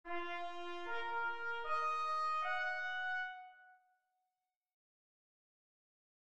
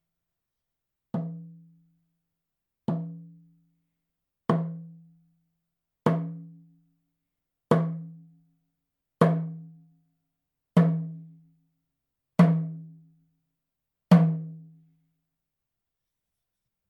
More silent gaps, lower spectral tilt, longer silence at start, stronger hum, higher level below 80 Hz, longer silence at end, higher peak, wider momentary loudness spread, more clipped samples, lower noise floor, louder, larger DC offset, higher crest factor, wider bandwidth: first, 4.56-4.61 s vs none; second, -2.5 dB/octave vs -9 dB/octave; second, 0.05 s vs 1.15 s; neither; about the same, -74 dBFS vs -76 dBFS; second, 1.6 s vs 2.25 s; second, -28 dBFS vs -4 dBFS; second, 9 LU vs 23 LU; neither; first, under -90 dBFS vs -86 dBFS; second, -40 LUFS vs -26 LUFS; first, 0.3% vs under 0.1%; second, 14 dB vs 26 dB; first, 9.6 kHz vs 6.4 kHz